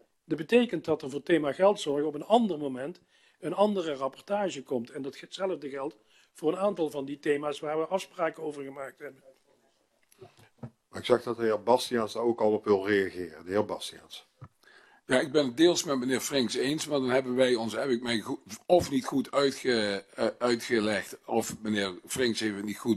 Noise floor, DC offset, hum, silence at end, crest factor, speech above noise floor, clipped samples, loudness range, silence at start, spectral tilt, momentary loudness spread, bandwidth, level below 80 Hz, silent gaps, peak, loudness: -70 dBFS; under 0.1%; none; 0 s; 20 dB; 41 dB; under 0.1%; 6 LU; 0.3 s; -4.5 dB/octave; 13 LU; 14 kHz; -68 dBFS; none; -8 dBFS; -29 LUFS